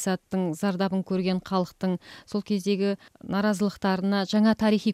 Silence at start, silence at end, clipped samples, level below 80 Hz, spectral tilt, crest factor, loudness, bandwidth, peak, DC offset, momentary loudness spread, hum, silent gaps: 0 s; 0 s; under 0.1%; -60 dBFS; -6 dB/octave; 14 dB; -26 LUFS; 14 kHz; -12 dBFS; under 0.1%; 8 LU; none; none